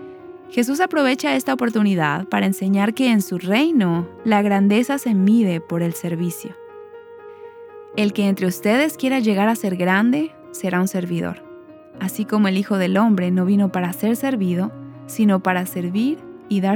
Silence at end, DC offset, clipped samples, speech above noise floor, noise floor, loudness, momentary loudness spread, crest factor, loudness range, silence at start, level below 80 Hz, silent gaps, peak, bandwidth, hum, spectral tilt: 0 s; under 0.1%; under 0.1%; 23 dB; -41 dBFS; -19 LUFS; 14 LU; 16 dB; 4 LU; 0 s; -66 dBFS; none; -2 dBFS; 19 kHz; none; -6 dB/octave